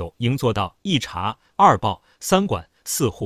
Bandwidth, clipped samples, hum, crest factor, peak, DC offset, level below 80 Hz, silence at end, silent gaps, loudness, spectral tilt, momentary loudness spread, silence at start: 16 kHz; under 0.1%; none; 20 dB; 0 dBFS; under 0.1%; -44 dBFS; 0 s; none; -21 LUFS; -4.5 dB/octave; 12 LU; 0 s